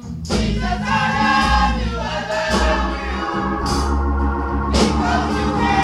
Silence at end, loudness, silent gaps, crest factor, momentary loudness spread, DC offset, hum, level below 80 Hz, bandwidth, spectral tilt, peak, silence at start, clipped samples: 0 s; -19 LUFS; none; 14 dB; 7 LU; under 0.1%; none; -24 dBFS; 12.5 kHz; -5 dB/octave; -4 dBFS; 0 s; under 0.1%